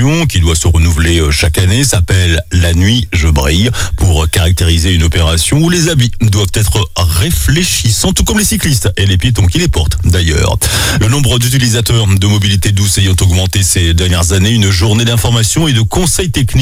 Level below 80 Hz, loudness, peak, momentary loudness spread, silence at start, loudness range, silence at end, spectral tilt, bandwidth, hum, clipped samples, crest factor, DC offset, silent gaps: -18 dBFS; -10 LUFS; 0 dBFS; 2 LU; 0 s; 1 LU; 0 s; -4 dB/octave; 16.5 kHz; none; under 0.1%; 10 dB; under 0.1%; none